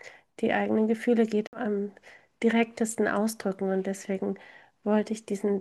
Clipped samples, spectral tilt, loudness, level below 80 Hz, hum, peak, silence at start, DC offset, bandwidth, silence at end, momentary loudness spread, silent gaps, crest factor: under 0.1%; -5.5 dB/octave; -28 LUFS; -74 dBFS; none; -10 dBFS; 0.05 s; under 0.1%; 12.5 kHz; 0 s; 8 LU; 1.47-1.52 s; 18 dB